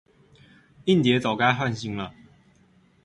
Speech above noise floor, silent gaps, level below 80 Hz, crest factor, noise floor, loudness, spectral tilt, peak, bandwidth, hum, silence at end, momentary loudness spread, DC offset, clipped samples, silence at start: 37 dB; none; -58 dBFS; 22 dB; -59 dBFS; -23 LUFS; -6 dB/octave; -6 dBFS; 11.5 kHz; none; 0.95 s; 13 LU; under 0.1%; under 0.1%; 0.85 s